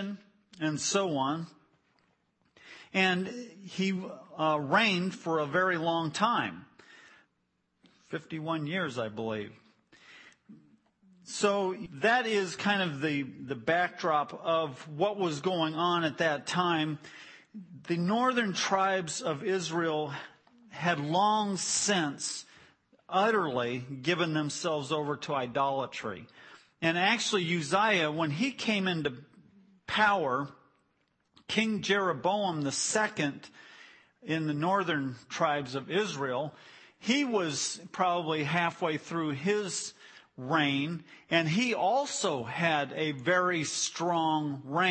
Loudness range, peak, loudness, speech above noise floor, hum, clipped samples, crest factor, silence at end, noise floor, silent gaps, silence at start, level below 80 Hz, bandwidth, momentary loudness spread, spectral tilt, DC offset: 4 LU; -12 dBFS; -30 LUFS; 47 dB; none; under 0.1%; 20 dB; 0 s; -77 dBFS; none; 0 s; -76 dBFS; 8.8 kHz; 12 LU; -4 dB/octave; under 0.1%